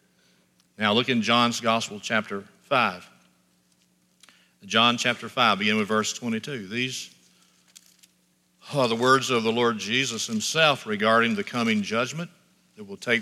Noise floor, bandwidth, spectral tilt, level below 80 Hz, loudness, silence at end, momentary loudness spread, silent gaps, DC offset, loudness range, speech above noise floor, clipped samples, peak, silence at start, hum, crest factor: -66 dBFS; 14.5 kHz; -3.5 dB/octave; -76 dBFS; -23 LUFS; 0 s; 11 LU; none; under 0.1%; 6 LU; 42 dB; under 0.1%; -4 dBFS; 0.8 s; none; 22 dB